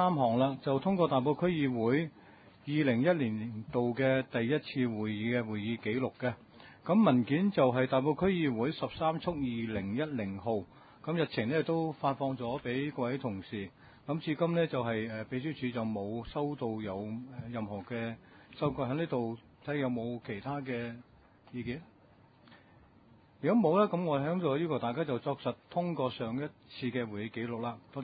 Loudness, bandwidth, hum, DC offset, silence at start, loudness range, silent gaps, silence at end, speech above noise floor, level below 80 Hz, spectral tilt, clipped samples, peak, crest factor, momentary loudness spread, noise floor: -33 LUFS; 4.9 kHz; none; under 0.1%; 0 s; 7 LU; none; 0 s; 29 dB; -64 dBFS; -6 dB/octave; under 0.1%; -14 dBFS; 20 dB; 12 LU; -62 dBFS